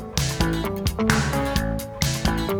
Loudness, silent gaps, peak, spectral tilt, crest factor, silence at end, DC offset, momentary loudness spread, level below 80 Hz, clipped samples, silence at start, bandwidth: -23 LUFS; none; 0 dBFS; -4.5 dB/octave; 22 dB; 0 s; under 0.1%; 4 LU; -30 dBFS; under 0.1%; 0 s; over 20 kHz